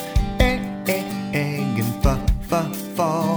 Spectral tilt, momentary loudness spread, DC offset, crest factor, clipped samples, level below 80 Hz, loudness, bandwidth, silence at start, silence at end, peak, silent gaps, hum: -6 dB/octave; 4 LU; under 0.1%; 20 dB; under 0.1%; -26 dBFS; -23 LUFS; over 20 kHz; 0 s; 0 s; -2 dBFS; none; none